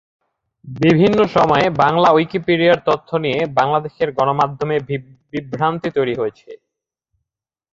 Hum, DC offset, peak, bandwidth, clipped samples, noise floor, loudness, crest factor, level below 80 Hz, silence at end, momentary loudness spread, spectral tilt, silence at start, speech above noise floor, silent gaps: none; under 0.1%; 0 dBFS; 7.6 kHz; under 0.1%; -81 dBFS; -17 LUFS; 16 dB; -52 dBFS; 1.2 s; 12 LU; -7 dB/octave; 0.65 s; 65 dB; none